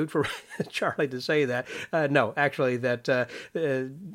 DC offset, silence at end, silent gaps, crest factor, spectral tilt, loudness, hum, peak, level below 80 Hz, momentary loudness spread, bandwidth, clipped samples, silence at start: under 0.1%; 0 s; none; 20 dB; -5.5 dB/octave; -27 LUFS; none; -6 dBFS; -68 dBFS; 7 LU; 16.5 kHz; under 0.1%; 0 s